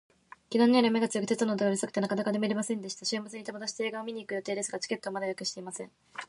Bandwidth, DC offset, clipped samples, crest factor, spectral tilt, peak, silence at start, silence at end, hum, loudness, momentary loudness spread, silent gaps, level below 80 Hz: 11.5 kHz; under 0.1%; under 0.1%; 20 dB; -4 dB/octave; -10 dBFS; 0.5 s; 0.05 s; none; -30 LUFS; 13 LU; none; -78 dBFS